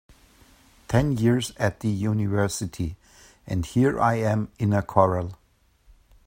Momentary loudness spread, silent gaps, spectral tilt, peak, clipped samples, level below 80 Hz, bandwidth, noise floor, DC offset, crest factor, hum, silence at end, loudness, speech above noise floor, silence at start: 10 LU; none; -6.5 dB/octave; -2 dBFS; under 0.1%; -46 dBFS; 16.5 kHz; -62 dBFS; under 0.1%; 24 dB; none; 0.95 s; -24 LUFS; 39 dB; 0.9 s